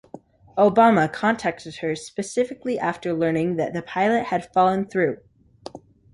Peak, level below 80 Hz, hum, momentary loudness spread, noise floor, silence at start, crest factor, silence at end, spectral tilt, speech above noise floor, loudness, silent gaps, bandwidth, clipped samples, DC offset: -4 dBFS; -60 dBFS; none; 14 LU; -45 dBFS; 0.15 s; 18 dB; 0.35 s; -6 dB/octave; 24 dB; -22 LUFS; none; 11.5 kHz; under 0.1%; under 0.1%